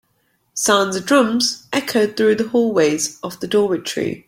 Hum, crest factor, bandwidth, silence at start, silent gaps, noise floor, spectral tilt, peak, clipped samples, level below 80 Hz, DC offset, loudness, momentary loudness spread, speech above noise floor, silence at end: none; 16 dB; 16.5 kHz; 0.55 s; none; -65 dBFS; -3 dB/octave; -2 dBFS; under 0.1%; -60 dBFS; under 0.1%; -17 LUFS; 7 LU; 47 dB; 0.1 s